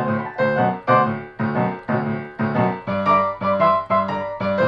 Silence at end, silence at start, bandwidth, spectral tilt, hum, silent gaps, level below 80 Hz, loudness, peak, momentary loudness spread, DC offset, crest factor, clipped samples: 0 s; 0 s; 6.2 kHz; -9 dB/octave; none; none; -56 dBFS; -20 LUFS; -4 dBFS; 7 LU; under 0.1%; 16 dB; under 0.1%